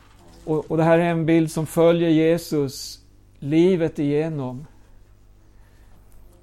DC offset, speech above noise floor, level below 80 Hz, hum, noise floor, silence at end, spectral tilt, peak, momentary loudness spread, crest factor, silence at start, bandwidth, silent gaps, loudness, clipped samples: under 0.1%; 31 dB; -50 dBFS; 50 Hz at -50 dBFS; -50 dBFS; 1.75 s; -7 dB/octave; -6 dBFS; 16 LU; 16 dB; 0.45 s; 14.5 kHz; none; -20 LUFS; under 0.1%